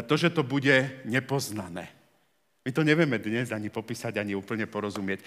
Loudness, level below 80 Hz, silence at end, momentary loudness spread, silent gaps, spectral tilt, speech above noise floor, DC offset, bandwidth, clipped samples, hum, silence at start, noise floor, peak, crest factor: -28 LUFS; -76 dBFS; 0.05 s; 13 LU; none; -5.5 dB/octave; 43 dB; under 0.1%; 16 kHz; under 0.1%; none; 0 s; -71 dBFS; -8 dBFS; 20 dB